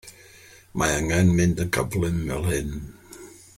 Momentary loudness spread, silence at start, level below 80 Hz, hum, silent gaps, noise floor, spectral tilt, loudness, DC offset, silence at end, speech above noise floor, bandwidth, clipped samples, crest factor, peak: 22 LU; 0.05 s; -40 dBFS; none; none; -50 dBFS; -5.5 dB/octave; -23 LUFS; under 0.1%; 0.2 s; 27 dB; 16.5 kHz; under 0.1%; 18 dB; -8 dBFS